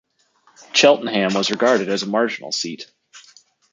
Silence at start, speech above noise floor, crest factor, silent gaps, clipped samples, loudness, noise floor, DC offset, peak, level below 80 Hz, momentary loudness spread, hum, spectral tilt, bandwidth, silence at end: 0.75 s; 41 dB; 20 dB; none; under 0.1%; -18 LUFS; -59 dBFS; under 0.1%; -2 dBFS; -70 dBFS; 13 LU; none; -3 dB/octave; 9.4 kHz; 0.55 s